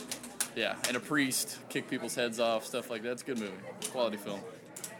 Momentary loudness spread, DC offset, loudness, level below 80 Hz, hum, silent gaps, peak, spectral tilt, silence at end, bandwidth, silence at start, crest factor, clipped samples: 11 LU; under 0.1%; -34 LUFS; -78 dBFS; none; none; -14 dBFS; -2.5 dB/octave; 0 s; over 20 kHz; 0 s; 22 dB; under 0.1%